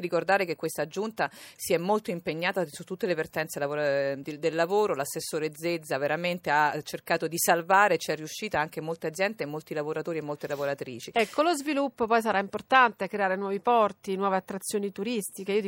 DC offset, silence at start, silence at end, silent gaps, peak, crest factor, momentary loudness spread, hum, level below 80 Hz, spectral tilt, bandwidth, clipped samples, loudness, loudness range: under 0.1%; 0 s; 0 s; none; -6 dBFS; 22 dB; 9 LU; none; -70 dBFS; -4 dB/octave; 16.5 kHz; under 0.1%; -28 LUFS; 4 LU